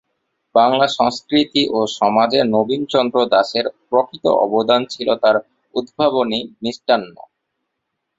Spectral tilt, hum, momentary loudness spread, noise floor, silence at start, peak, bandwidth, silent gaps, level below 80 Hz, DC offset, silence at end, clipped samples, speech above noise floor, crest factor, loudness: -5 dB/octave; none; 7 LU; -76 dBFS; 0.55 s; -2 dBFS; 8 kHz; none; -60 dBFS; under 0.1%; 1.1 s; under 0.1%; 59 dB; 16 dB; -17 LUFS